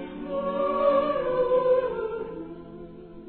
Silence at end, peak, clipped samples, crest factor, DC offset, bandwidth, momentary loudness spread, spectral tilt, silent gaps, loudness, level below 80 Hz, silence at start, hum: 0 s; -10 dBFS; under 0.1%; 16 dB; under 0.1%; 4.4 kHz; 20 LU; -10 dB/octave; none; -25 LUFS; -54 dBFS; 0 s; none